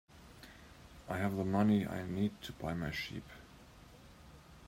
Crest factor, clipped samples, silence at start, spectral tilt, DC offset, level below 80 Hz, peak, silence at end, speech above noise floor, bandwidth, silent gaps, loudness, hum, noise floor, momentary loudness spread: 20 dB; under 0.1%; 0.1 s; -7 dB/octave; under 0.1%; -60 dBFS; -20 dBFS; 0 s; 22 dB; 16 kHz; none; -36 LUFS; none; -57 dBFS; 26 LU